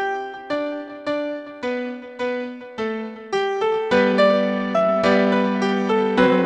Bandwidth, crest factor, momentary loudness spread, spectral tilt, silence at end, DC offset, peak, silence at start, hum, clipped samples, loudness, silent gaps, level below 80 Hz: 9.2 kHz; 16 dB; 12 LU; -6.5 dB/octave; 0 s; under 0.1%; -4 dBFS; 0 s; none; under 0.1%; -21 LUFS; none; -58 dBFS